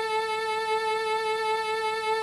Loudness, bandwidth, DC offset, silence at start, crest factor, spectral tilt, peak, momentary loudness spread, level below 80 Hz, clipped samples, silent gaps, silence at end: -27 LUFS; 12.5 kHz; under 0.1%; 0 s; 12 dB; -1 dB/octave; -16 dBFS; 1 LU; -68 dBFS; under 0.1%; none; 0 s